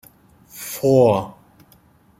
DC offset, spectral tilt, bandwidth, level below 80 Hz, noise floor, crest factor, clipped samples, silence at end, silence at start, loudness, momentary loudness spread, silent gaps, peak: under 0.1%; -6.5 dB/octave; 16.5 kHz; -56 dBFS; -54 dBFS; 18 dB; under 0.1%; 0.9 s; 0.55 s; -18 LUFS; 20 LU; none; -2 dBFS